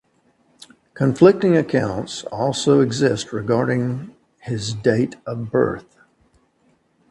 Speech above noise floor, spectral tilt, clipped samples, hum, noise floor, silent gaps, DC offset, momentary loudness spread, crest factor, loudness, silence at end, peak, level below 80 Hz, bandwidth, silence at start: 43 dB; -6 dB/octave; under 0.1%; none; -62 dBFS; none; under 0.1%; 15 LU; 20 dB; -19 LUFS; 1.3 s; 0 dBFS; -54 dBFS; 11.5 kHz; 0.95 s